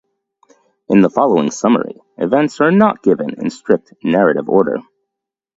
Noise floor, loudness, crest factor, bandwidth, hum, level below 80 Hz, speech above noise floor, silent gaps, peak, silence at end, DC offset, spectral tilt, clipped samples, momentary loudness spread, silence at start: -81 dBFS; -15 LUFS; 16 dB; 8 kHz; none; -58 dBFS; 67 dB; none; 0 dBFS; 0.75 s; under 0.1%; -6.5 dB/octave; under 0.1%; 10 LU; 0.9 s